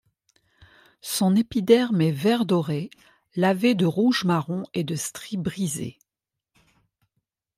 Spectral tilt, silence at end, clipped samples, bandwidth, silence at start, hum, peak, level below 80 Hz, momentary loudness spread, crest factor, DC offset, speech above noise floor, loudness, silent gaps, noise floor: -5.5 dB/octave; 1.65 s; under 0.1%; 16 kHz; 1.05 s; none; -4 dBFS; -62 dBFS; 12 LU; 20 dB; under 0.1%; 65 dB; -23 LUFS; none; -87 dBFS